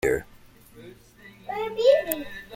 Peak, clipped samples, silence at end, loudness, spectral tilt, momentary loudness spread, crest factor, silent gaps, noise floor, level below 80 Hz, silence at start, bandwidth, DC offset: -4 dBFS; under 0.1%; 0 s; -24 LUFS; -3.5 dB/octave; 14 LU; 24 dB; none; -51 dBFS; -52 dBFS; 0.05 s; 16.5 kHz; under 0.1%